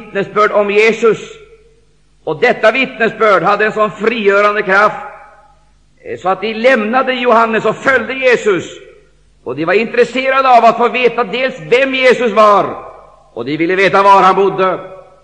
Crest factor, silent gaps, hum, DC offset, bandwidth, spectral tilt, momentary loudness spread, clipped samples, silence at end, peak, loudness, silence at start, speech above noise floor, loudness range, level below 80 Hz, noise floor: 12 dB; none; none; 0.2%; 9.8 kHz; -5 dB/octave; 13 LU; under 0.1%; 0.25 s; 0 dBFS; -11 LUFS; 0 s; 41 dB; 3 LU; -54 dBFS; -52 dBFS